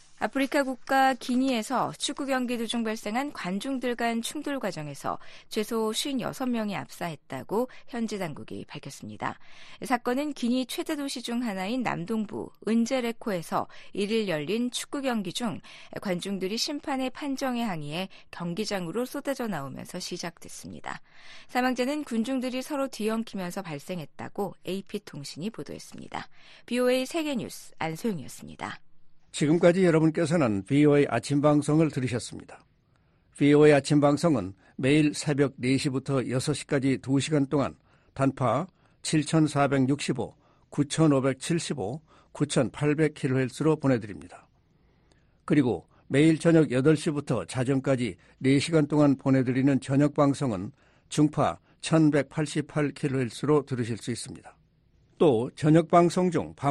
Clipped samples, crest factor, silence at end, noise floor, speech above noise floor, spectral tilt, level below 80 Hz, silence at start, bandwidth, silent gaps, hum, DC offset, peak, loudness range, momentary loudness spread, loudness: under 0.1%; 20 dB; 0 s; -65 dBFS; 38 dB; -6 dB/octave; -60 dBFS; 0.1 s; 13 kHz; none; none; under 0.1%; -8 dBFS; 8 LU; 15 LU; -27 LUFS